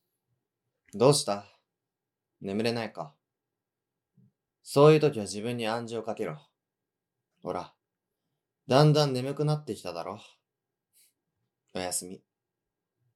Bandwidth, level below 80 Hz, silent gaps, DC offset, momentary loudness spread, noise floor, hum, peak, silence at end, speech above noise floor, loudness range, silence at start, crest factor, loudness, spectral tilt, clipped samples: 14 kHz; -80 dBFS; none; under 0.1%; 22 LU; -88 dBFS; none; -8 dBFS; 1 s; 61 dB; 10 LU; 0.95 s; 24 dB; -27 LUFS; -5.5 dB/octave; under 0.1%